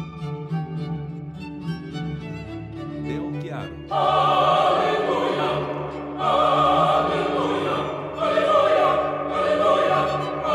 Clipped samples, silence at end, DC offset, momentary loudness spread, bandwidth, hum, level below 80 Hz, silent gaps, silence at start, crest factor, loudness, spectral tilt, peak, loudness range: under 0.1%; 0 s; under 0.1%; 15 LU; 11.5 kHz; none; -50 dBFS; none; 0 s; 14 dB; -22 LUFS; -6 dB/octave; -8 dBFS; 11 LU